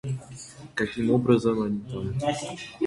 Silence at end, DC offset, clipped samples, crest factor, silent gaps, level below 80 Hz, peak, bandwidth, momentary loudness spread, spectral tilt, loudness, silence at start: 0 s; under 0.1%; under 0.1%; 20 dB; none; -52 dBFS; -8 dBFS; 11.5 kHz; 14 LU; -6.5 dB/octave; -27 LUFS; 0.05 s